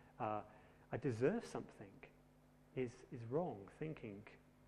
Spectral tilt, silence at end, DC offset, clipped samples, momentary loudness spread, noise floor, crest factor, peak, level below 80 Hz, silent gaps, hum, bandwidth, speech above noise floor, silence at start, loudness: -7.5 dB/octave; 0 s; under 0.1%; under 0.1%; 22 LU; -69 dBFS; 22 dB; -26 dBFS; -74 dBFS; none; none; 12.5 kHz; 24 dB; 0 s; -45 LUFS